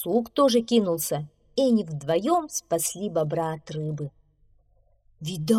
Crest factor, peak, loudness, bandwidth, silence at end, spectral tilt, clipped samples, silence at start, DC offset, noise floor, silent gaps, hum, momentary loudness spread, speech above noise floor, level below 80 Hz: 18 dB; -8 dBFS; -25 LUFS; 17.5 kHz; 0 s; -5 dB/octave; under 0.1%; 0 s; under 0.1%; -62 dBFS; none; none; 11 LU; 38 dB; -62 dBFS